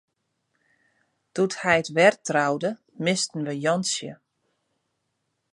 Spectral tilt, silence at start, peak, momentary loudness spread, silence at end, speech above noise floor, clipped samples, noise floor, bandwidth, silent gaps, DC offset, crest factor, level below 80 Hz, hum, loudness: -4 dB/octave; 1.35 s; -4 dBFS; 11 LU; 1.4 s; 53 dB; under 0.1%; -77 dBFS; 11.5 kHz; none; under 0.1%; 22 dB; -68 dBFS; none; -24 LUFS